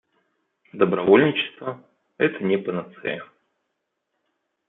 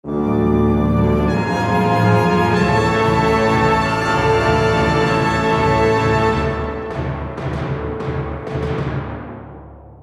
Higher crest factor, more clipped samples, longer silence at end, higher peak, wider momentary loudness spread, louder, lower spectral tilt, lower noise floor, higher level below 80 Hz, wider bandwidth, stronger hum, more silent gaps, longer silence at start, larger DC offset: first, 22 dB vs 14 dB; neither; first, 1.45 s vs 0 s; about the same, -2 dBFS vs -2 dBFS; first, 18 LU vs 10 LU; second, -22 LUFS vs -17 LUFS; first, -10 dB/octave vs -7 dB/octave; first, -78 dBFS vs -37 dBFS; second, -68 dBFS vs -30 dBFS; second, 4 kHz vs 12.5 kHz; neither; neither; first, 0.75 s vs 0.05 s; neither